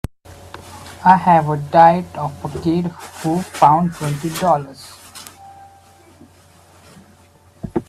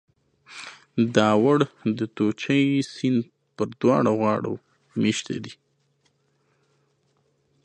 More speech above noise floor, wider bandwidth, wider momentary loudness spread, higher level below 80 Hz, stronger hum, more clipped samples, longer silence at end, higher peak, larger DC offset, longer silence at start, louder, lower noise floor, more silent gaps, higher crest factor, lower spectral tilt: second, 34 dB vs 46 dB; first, 15 kHz vs 10 kHz; first, 25 LU vs 20 LU; first, -48 dBFS vs -66 dBFS; neither; neither; second, 0.05 s vs 2.1 s; about the same, 0 dBFS vs -2 dBFS; neither; second, 0.3 s vs 0.5 s; first, -16 LUFS vs -23 LUFS; second, -49 dBFS vs -68 dBFS; neither; about the same, 18 dB vs 22 dB; about the same, -6.5 dB/octave vs -6 dB/octave